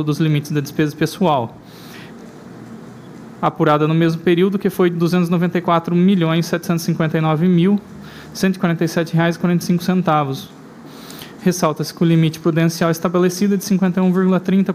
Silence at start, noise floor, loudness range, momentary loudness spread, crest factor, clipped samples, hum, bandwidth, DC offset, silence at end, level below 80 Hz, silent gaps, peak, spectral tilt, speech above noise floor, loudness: 0 s; -37 dBFS; 4 LU; 21 LU; 14 dB; under 0.1%; none; 15.5 kHz; under 0.1%; 0 s; -56 dBFS; none; -2 dBFS; -6.5 dB/octave; 21 dB; -17 LUFS